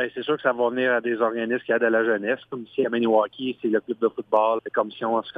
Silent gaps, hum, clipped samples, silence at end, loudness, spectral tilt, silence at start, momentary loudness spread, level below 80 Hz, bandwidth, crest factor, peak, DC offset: none; none; under 0.1%; 0 s; -24 LUFS; -7.5 dB/octave; 0 s; 6 LU; -74 dBFS; 4.8 kHz; 16 dB; -8 dBFS; under 0.1%